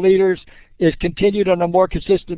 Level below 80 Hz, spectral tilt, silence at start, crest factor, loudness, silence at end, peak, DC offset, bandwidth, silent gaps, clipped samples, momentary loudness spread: -38 dBFS; -11 dB/octave; 0 s; 14 dB; -17 LUFS; 0 s; -2 dBFS; under 0.1%; 4 kHz; none; under 0.1%; 4 LU